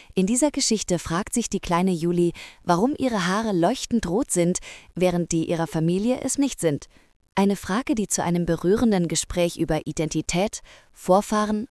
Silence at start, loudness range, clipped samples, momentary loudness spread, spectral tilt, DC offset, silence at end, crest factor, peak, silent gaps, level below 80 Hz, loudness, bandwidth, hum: 0.15 s; 1 LU; under 0.1%; 5 LU; -5 dB/octave; under 0.1%; 0.05 s; 18 dB; -6 dBFS; 7.16-7.20 s; -46 dBFS; -23 LUFS; 12 kHz; none